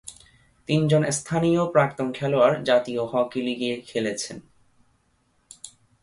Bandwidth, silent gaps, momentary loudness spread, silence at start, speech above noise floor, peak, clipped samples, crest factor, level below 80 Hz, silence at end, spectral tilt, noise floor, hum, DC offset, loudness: 11.5 kHz; none; 22 LU; 0.05 s; 44 dB; -6 dBFS; under 0.1%; 20 dB; -60 dBFS; 0.35 s; -5.5 dB/octave; -67 dBFS; none; under 0.1%; -23 LUFS